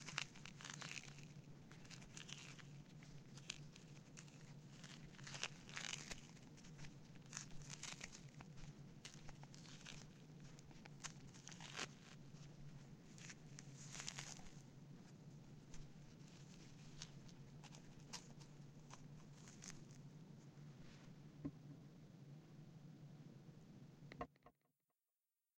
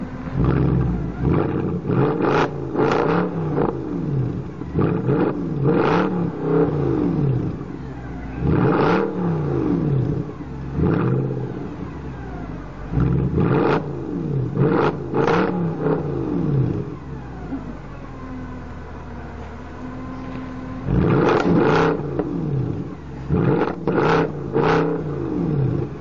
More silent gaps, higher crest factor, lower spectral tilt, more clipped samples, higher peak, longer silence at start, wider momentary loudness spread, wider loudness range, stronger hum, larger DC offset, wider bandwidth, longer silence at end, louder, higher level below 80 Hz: neither; first, 34 dB vs 14 dB; second, -3 dB/octave vs -9 dB/octave; neither; second, -24 dBFS vs -8 dBFS; about the same, 0 s vs 0 s; second, 11 LU vs 15 LU; about the same, 7 LU vs 6 LU; neither; second, under 0.1% vs 0.8%; first, 16.5 kHz vs 7.2 kHz; first, 0.9 s vs 0 s; second, -57 LUFS vs -21 LUFS; second, -70 dBFS vs -36 dBFS